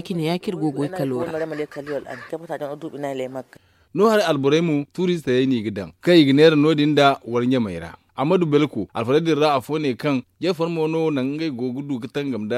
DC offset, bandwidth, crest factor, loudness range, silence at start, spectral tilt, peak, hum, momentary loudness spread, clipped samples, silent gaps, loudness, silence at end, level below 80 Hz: under 0.1%; 14 kHz; 20 dB; 9 LU; 0 s; -6.5 dB/octave; -2 dBFS; none; 14 LU; under 0.1%; none; -21 LUFS; 0 s; -60 dBFS